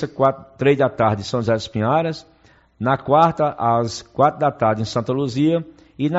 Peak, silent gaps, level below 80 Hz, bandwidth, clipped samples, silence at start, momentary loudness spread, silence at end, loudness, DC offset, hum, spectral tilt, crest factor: -2 dBFS; none; -52 dBFS; 8 kHz; under 0.1%; 0 s; 8 LU; 0 s; -19 LUFS; under 0.1%; none; -6 dB/octave; 16 dB